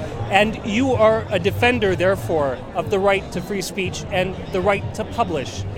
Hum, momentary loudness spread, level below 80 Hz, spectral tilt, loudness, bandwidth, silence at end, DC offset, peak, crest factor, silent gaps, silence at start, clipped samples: none; 8 LU; -40 dBFS; -5.5 dB/octave; -20 LUFS; 17 kHz; 0 s; under 0.1%; 0 dBFS; 20 dB; none; 0 s; under 0.1%